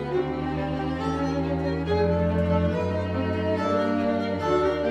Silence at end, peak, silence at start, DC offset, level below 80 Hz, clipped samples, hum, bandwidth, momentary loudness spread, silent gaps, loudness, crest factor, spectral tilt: 0 s; -12 dBFS; 0 s; under 0.1%; -42 dBFS; under 0.1%; none; 9.4 kHz; 5 LU; none; -25 LUFS; 14 dB; -8 dB/octave